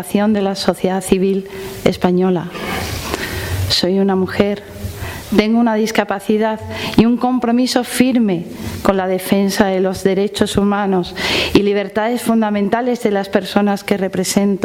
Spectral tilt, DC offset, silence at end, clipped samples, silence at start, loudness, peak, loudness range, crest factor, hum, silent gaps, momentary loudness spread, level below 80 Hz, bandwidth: -5 dB/octave; under 0.1%; 0 s; under 0.1%; 0 s; -16 LUFS; 0 dBFS; 2 LU; 16 dB; none; none; 8 LU; -40 dBFS; 16.5 kHz